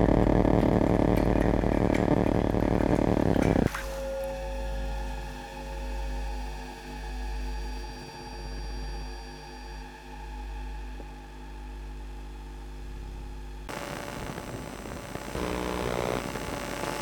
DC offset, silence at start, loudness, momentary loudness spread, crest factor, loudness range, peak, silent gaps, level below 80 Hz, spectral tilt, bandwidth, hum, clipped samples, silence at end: under 0.1%; 0 s; -29 LUFS; 18 LU; 22 dB; 17 LU; -8 dBFS; none; -36 dBFS; -6.5 dB/octave; 19.5 kHz; none; under 0.1%; 0 s